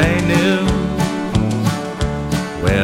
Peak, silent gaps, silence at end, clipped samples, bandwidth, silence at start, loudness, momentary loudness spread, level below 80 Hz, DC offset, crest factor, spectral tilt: 0 dBFS; none; 0 s; under 0.1%; 16.5 kHz; 0 s; -18 LUFS; 7 LU; -28 dBFS; under 0.1%; 16 dB; -6 dB/octave